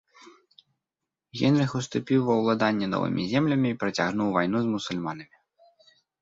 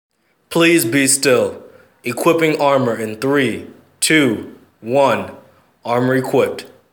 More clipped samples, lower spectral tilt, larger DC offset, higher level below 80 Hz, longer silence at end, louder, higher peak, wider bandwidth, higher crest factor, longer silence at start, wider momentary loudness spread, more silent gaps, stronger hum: neither; first, -6.5 dB/octave vs -4 dB/octave; neither; about the same, -62 dBFS vs -66 dBFS; first, 1 s vs 0.25 s; second, -26 LUFS vs -16 LUFS; second, -8 dBFS vs 0 dBFS; second, 7.8 kHz vs over 20 kHz; about the same, 18 dB vs 16 dB; first, 1.35 s vs 0.5 s; second, 8 LU vs 14 LU; neither; neither